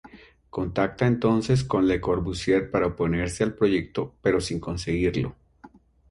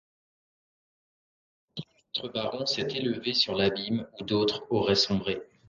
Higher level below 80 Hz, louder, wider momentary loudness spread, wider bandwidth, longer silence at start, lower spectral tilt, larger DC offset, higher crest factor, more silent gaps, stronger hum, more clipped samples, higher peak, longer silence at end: first, -44 dBFS vs -60 dBFS; first, -25 LUFS vs -28 LUFS; second, 8 LU vs 13 LU; first, 11.5 kHz vs 7.4 kHz; second, 0.05 s vs 1.75 s; first, -6.5 dB/octave vs -4.5 dB/octave; neither; about the same, 18 dB vs 20 dB; neither; neither; neither; first, -8 dBFS vs -12 dBFS; first, 0.45 s vs 0.25 s